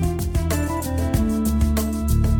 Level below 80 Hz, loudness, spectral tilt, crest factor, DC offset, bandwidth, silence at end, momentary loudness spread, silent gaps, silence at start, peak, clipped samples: -24 dBFS; -22 LUFS; -6.5 dB/octave; 12 dB; under 0.1%; over 20 kHz; 0 s; 3 LU; none; 0 s; -8 dBFS; under 0.1%